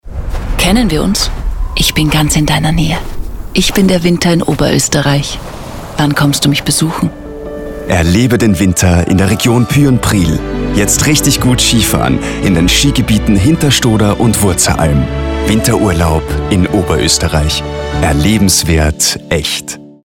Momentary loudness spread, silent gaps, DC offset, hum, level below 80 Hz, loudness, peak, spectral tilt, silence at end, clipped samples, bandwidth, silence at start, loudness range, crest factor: 9 LU; none; 0.4%; none; -22 dBFS; -11 LUFS; 0 dBFS; -4.5 dB/octave; 0.15 s; under 0.1%; 18.5 kHz; 0.05 s; 3 LU; 10 dB